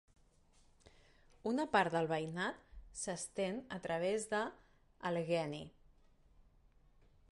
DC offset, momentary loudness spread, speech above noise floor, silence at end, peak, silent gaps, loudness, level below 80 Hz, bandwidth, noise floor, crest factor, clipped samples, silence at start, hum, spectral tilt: under 0.1%; 12 LU; 31 dB; 1.65 s; -18 dBFS; none; -39 LUFS; -68 dBFS; 11.5 kHz; -69 dBFS; 22 dB; under 0.1%; 1.45 s; none; -4.5 dB/octave